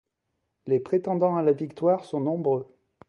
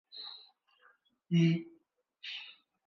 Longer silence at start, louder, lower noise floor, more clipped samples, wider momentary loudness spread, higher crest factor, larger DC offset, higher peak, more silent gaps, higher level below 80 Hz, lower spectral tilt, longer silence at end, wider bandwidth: first, 0.65 s vs 0.15 s; first, -26 LUFS vs -34 LUFS; first, -79 dBFS vs -71 dBFS; neither; second, 5 LU vs 23 LU; about the same, 16 dB vs 18 dB; neither; first, -10 dBFS vs -18 dBFS; neither; first, -72 dBFS vs -86 dBFS; first, -9.5 dB/octave vs -7.5 dB/octave; about the same, 0.45 s vs 0.35 s; first, 9.4 kHz vs 6.2 kHz